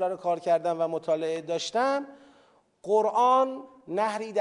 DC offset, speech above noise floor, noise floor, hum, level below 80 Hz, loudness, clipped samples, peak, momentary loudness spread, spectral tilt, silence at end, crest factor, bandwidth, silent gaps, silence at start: under 0.1%; 35 dB; -62 dBFS; none; -82 dBFS; -27 LUFS; under 0.1%; -12 dBFS; 11 LU; -4.5 dB/octave; 0 s; 16 dB; 11 kHz; none; 0 s